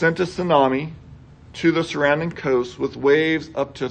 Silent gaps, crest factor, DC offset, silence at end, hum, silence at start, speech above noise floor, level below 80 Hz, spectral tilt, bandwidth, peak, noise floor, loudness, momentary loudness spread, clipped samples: none; 18 dB; under 0.1%; 0 s; none; 0 s; 24 dB; -50 dBFS; -6 dB/octave; 9.4 kHz; -2 dBFS; -44 dBFS; -20 LUFS; 9 LU; under 0.1%